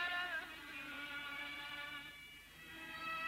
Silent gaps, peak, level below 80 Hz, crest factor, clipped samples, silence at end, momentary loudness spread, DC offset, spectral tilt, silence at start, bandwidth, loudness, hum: none; -32 dBFS; -72 dBFS; 16 dB; under 0.1%; 0 s; 12 LU; under 0.1%; -2 dB/octave; 0 s; 16 kHz; -46 LUFS; none